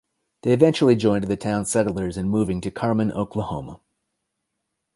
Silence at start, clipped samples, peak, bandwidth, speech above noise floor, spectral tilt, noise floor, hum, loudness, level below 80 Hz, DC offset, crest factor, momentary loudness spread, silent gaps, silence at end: 0.45 s; under 0.1%; -2 dBFS; 11.5 kHz; 58 dB; -6 dB/octave; -79 dBFS; none; -22 LUFS; -48 dBFS; under 0.1%; 20 dB; 11 LU; none; 1.2 s